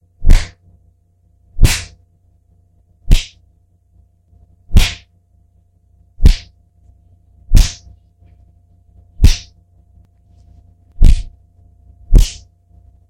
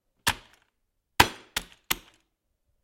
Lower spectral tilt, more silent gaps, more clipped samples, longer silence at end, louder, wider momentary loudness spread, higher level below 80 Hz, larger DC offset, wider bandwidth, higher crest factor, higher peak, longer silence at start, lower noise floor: first, -4.5 dB/octave vs -2 dB/octave; neither; first, 1% vs under 0.1%; about the same, 0.75 s vs 0.85 s; first, -17 LUFS vs -27 LUFS; first, 18 LU vs 13 LU; first, -16 dBFS vs -50 dBFS; neither; about the same, 15.5 kHz vs 16.5 kHz; second, 14 dB vs 30 dB; about the same, 0 dBFS vs -2 dBFS; about the same, 0.2 s vs 0.25 s; second, -54 dBFS vs -77 dBFS